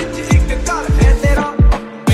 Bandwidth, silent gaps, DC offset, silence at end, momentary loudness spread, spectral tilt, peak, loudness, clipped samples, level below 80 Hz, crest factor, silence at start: 12.5 kHz; none; under 0.1%; 0 s; 5 LU; -6 dB/octave; 0 dBFS; -15 LUFS; under 0.1%; -14 dBFS; 12 dB; 0 s